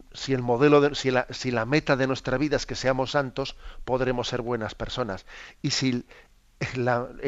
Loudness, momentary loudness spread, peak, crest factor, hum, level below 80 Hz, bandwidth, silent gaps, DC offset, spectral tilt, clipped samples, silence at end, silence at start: -26 LUFS; 12 LU; -6 dBFS; 20 dB; none; -46 dBFS; 8 kHz; none; under 0.1%; -5 dB/octave; under 0.1%; 0 s; 0.1 s